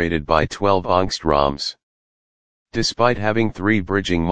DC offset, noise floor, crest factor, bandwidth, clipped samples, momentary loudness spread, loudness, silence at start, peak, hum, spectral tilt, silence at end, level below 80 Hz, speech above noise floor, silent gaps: 2%; under -90 dBFS; 20 dB; 9.8 kHz; under 0.1%; 5 LU; -19 LUFS; 0 s; 0 dBFS; none; -5 dB/octave; 0 s; -38 dBFS; over 71 dB; 1.83-2.66 s